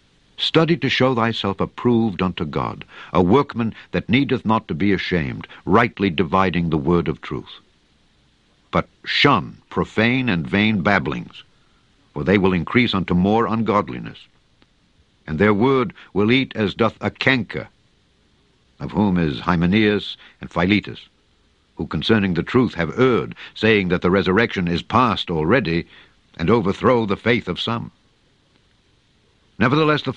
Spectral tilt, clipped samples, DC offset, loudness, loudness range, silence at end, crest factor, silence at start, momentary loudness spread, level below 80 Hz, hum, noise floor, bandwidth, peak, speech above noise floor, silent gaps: -7 dB/octave; under 0.1%; under 0.1%; -19 LUFS; 3 LU; 0 s; 20 dB; 0.4 s; 12 LU; -46 dBFS; none; -60 dBFS; 8.4 kHz; 0 dBFS; 41 dB; none